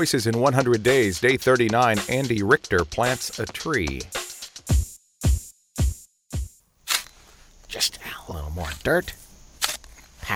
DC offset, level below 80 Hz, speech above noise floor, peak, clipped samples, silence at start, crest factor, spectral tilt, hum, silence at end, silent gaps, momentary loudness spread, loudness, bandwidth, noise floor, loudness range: under 0.1%; -34 dBFS; 29 dB; -4 dBFS; under 0.1%; 0 s; 20 dB; -4.5 dB/octave; none; 0 s; none; 17 LU; -23 LUFS; 19.5 kHz; -51 dBFS; 8 LU